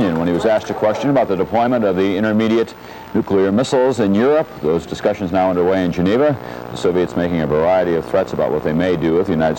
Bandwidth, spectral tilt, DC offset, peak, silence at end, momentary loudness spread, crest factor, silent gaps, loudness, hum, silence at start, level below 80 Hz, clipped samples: 16.5 kHz; -7 dB/octave; under 0.1%; -6 dBFS; 0 s; 5 LU; 10 dB; none; -17 LUFS; none; 0 s; -48 dBFS; under 0.1%